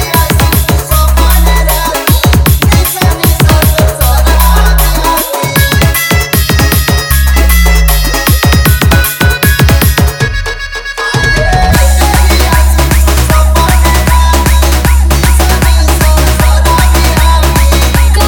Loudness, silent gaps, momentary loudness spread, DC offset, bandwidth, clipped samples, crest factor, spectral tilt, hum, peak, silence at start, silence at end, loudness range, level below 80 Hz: -8 LUFS; none; 3 LU; under 0.1%; 19.5 kHz; 1%; 6 dB; -4.5 dB/octave; none; 0 dBFS; 0 s; 0 s; 1 LU; -8 dBFS